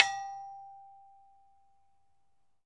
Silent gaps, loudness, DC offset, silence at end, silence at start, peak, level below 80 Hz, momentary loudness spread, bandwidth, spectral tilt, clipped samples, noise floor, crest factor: none; -34 LUFS; under 0.1%; 1.65 s; 0 s; -2 dBFS; -82 dBFS; 23 LU; 11 kHz; 1.5 dB/octave; under 0.1%; -79 dBFS; 36 dB